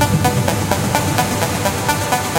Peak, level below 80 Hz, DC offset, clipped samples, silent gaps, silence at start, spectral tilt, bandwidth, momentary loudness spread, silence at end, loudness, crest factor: 0 dBFS; -36 dBFS; under 0.1%; under 0.1%; none; 0 s; -4.5 dB/octave; 17.5 kHz; 2 LU; 0 s; -17 LUFS; 16 dB